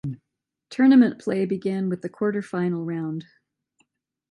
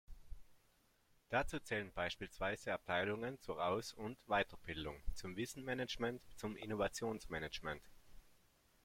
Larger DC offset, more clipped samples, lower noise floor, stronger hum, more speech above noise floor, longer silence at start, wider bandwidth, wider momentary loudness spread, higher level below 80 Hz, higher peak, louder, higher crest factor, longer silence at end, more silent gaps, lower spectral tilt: neither; neither; first, -83 dBFS vs -75 dBFS; neither; first, 61 dB vs 32 dB; about the same, 0.05 s vs 0.1 s; second, 9.4 kHz vs 16.5 kHz; first, 19 LU vs 10 LU; second, -68 dBFS vs -58 dBFS; first, -6 dBFS vs -22 dBFS; first, -23 LUFS vs -43 LUFS; about the same, 18 dB vs 22 dB; first, 1.1 s vs 0.5 s; neither; first, -8 dB/octave vs -4.5 dB/octave